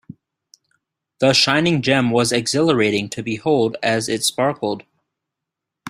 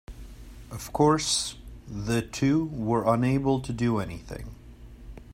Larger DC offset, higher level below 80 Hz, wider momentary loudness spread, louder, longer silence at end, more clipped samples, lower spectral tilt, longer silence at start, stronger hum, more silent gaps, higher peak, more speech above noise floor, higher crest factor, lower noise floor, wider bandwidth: neither; second, -58 dBFS vs -46 dBFS; second, 9 LU vs 23 LU; first, -18 LUFS vs -26 LUFS; about the same, 0 s vs 0 s; neither; about the same, -4 dB/octave vs -5 dB/octave; first, 1.2 s vs 0.1 s; neither; neither; first, -2 dBFS vs -8 dBFS; first, 65 dB vs 20 dB; about the same, 18 dB vs 20 dB; first, -83 dBFS vs -46 dBFS; about the same, 16 kHz vs 16 kHz